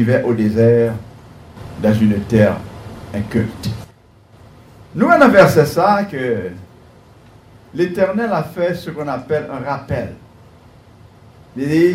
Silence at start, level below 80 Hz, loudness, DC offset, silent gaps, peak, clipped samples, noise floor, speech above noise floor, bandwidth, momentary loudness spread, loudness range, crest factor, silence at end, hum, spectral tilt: 0 s; -44 dBFS; -16 LUFS; under 0.1%; none; 0 dBFS; under 0.1%; -47 dBFS; 32 dB; 16 kHz; 20 LU; 7 LU; 16 dB; 0 s; none; -7.5 dB/octave